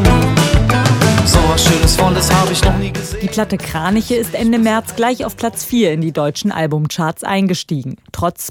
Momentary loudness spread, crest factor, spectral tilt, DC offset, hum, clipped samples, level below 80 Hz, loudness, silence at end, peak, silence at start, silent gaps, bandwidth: 9 LU; 14 dB; -5 dB/octave; under 0.1%; none; under 0.1%; -24 dBFS; -15 LUFS; 0 s; 0 dBFS; 0 s; none; 18.5 kHz